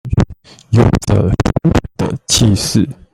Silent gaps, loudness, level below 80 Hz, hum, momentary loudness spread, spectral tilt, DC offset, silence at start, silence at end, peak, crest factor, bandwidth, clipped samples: none; -14 LUFS; -26 dBFS; none; 7 LU; -5.5 dB/octave; under 0.1%; 0.05 s; 0.2 s; 0 dBFS; 14 dB; 14.5 kHz; under 0.1%